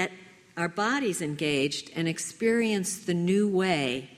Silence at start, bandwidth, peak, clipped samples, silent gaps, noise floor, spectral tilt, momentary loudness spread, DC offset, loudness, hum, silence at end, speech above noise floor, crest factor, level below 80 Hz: 0 s; 15.5 kHz; -10 dBFS; under 0.1%; none; -50 dBFS; -4.5 dB/octave; 7 LU; under 0.1%; -27 LUFS; none; 0 s; 22 dB; 18 dB; -68 dBFS